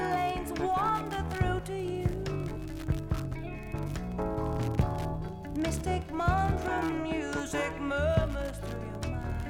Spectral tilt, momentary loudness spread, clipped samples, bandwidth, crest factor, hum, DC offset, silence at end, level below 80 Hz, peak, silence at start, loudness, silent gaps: -6.5 dB/octave; 9 LU; under 0.1%; 17 kHz; 18 dB; none; under 0.1%; 0 s; -40 dBFS; -14 dBFS; 0 s; -32 LUFS; none